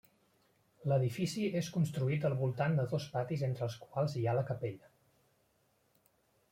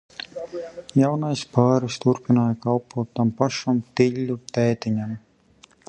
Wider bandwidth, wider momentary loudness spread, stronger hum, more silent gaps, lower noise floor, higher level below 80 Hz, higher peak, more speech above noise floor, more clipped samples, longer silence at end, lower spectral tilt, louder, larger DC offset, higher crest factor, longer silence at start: first, 16 kHz vs 9.4 kHz; second, 7 LU vs 13 LU; neither; neither; first, -74 dBFS vs -55 dBFS; second, -72 dBFS vs -60 dBFS; second, -20 dBFS vs -2 dBFS; first, 40 dB vs 33 dB; neither; first, 1.75 s vs 0.7 s; about the same, -7 dB/octave vs -7 dB/octave; second, -35 LUFS vs -23 LUFS; neither; about the same, 16 dB vs 20 dB; first, 0.8 s vs 0.35 s